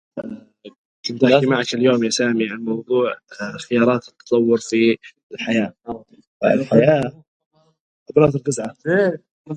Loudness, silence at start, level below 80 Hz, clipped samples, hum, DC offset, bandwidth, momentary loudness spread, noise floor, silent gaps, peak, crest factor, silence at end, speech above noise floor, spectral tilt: -19 LUFS; 0.15 s; -58 dBFS; under 0.1%; none; under 0.1%; 10.5 kHz; 17 LU; -38 dBFS; 0.78-1.03 s, 5.23-5.30 s, 6.27-6.40 s, 7.27-7.40 s, 7.46-7.51 s, 7.80-8.06 s, 9.31-9.45 s; 0 dBFS; 20 dB; 0 s; 19 dB; -5.5 dB/octave